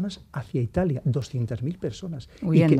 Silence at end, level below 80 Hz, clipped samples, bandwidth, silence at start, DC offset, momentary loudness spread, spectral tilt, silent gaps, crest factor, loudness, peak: 0 s; -50 dBFS; under 0.1%; 10 kHz; 0 s; under 0.1%; 12 LU; -8 dB/octave; none; 18 dB; -27 LUFS; -6 dBFS